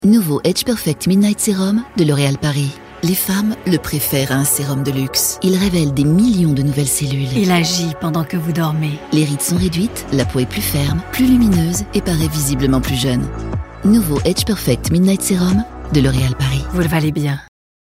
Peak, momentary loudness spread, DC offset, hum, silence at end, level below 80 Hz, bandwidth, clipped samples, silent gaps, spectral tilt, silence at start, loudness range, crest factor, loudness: 0 dBFS; 5 LU; under 0.1%; none; 0.4 s; -32 dBFS; 16.5 kHz; under 0.1%; none; -5 dB/octave; 0 s; 2 LU; 16 dB; -16 LUFS